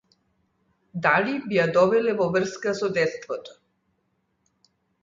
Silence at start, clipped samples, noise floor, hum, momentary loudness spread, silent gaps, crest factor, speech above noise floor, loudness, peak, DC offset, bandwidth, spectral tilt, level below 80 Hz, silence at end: 0.95 s; under 0.1%; -72 dBFS; none; 14 LU; none; 20 dB; 49 dB; -23 LUFS; -6 dBFS; under 0.1%; 7.6 kHz; -5.5 dB/octave; -66 dBFS; 1.55 s